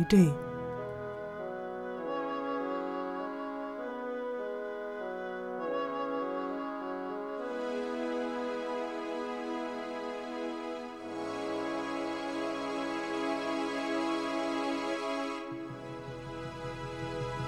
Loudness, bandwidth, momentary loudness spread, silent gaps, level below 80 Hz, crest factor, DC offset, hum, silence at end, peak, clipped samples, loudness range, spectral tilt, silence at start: -35 LUFS; 14 kHz; 7 LU; none; -62 dBFS; 22 dB; under 0.1%; 50 Hz at -70 dBFS; 0 s; -12 dBFS; under 0.1%; 3 LU; -6.5 dB/octave; 0 s